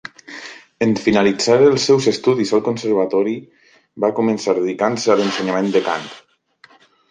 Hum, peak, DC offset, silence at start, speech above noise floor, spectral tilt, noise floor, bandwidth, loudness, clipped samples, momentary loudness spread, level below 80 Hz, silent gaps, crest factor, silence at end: none; -2 dBFS; under 0.1%; 0.3 s; 35 dB; -5 dB/octave; -51 dBFS; 9.6 kHz; -17 LUFS; under 0.1%; 17 LU; -58 dBFS; none; 16 dB; 0.9 s